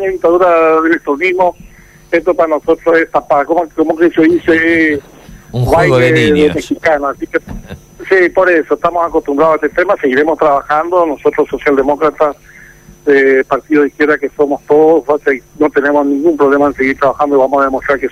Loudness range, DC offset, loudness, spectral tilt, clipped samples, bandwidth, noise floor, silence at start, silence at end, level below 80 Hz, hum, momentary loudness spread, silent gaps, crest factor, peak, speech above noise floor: 2 LU; under 0.1%; -11 LUFS; -6.5 dB/octave; under 0.1%; 14.5 kHz; -38 dBFS; 0 s; 0 s; -40 dBFS; none; 6 LU; none; 10 dB; -2 dBFS; 27 dB